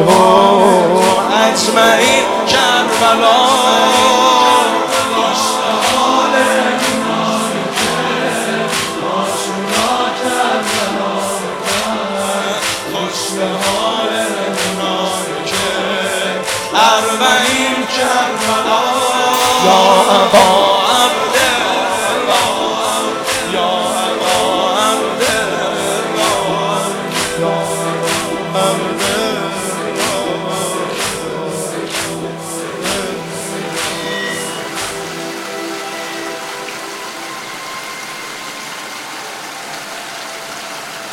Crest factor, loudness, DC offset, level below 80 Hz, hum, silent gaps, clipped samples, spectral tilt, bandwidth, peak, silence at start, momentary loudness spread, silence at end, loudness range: 14 dB; -14 LUFS; under 0.1%; -50 dBFS; none; none; 0.1%; -2.5 dB/octave; over 20 kHz; 0 dBFS; 0 s; 15 LU; 0 s; 12 LU